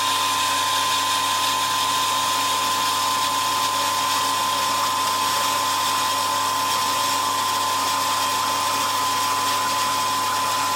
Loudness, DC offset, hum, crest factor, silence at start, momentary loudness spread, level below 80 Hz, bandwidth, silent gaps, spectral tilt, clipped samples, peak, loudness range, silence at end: -20 LUFS; under 0.1%; none; 12 dB; 0 s; 1 LU; -72 dBFS; 17 kHz; none; -0.5 dB/octave; under 0.1%; -8 dBFS; 1 LU; 0 s